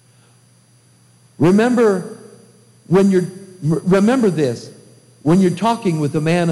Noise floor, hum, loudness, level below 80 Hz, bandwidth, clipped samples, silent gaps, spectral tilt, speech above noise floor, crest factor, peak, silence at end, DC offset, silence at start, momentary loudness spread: -52 dBFS; none; -16 LUFS; -54 dBFS; 12.5 kHz; under 0.1%; none; -7 dB/octave; 37 dB; 14 dB; -4 dBFS; 0 s; under 0.1%; 1.4 s; 10 LU